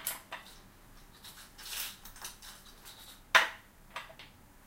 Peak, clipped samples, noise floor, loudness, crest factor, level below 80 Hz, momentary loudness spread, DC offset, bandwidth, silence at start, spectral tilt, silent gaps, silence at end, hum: -8 dBFS; under 0.1%; -56 dBFS; -33 LUFS; 30 dB; -60 dBFS; 26 LU; under 0.1%; 17 kHz; 0 s; 0 dB/octave; none; 0.4 s; none